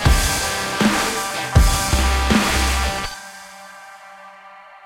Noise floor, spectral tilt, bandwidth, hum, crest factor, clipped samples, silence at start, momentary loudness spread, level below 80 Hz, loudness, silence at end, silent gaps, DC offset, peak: -42 dBFS; -3.5 dB/octave; 16.5 kHz; none; 18 dB; under 0.1%; 0 s; 22 LU; -24 dBFS; -18 LUFS; 0.1 s; none; under 0.1%; 0 dBFS